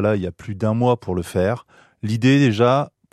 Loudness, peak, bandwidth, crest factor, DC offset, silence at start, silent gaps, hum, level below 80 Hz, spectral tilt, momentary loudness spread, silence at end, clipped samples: -19 LUFS; -4 dBFS; 13.5 kHz; 16 dB; under 0.1%; 0 s; none; none; -52 dBFS; -7 dB/octave; 12 LU; 0.25 s; under 0.1%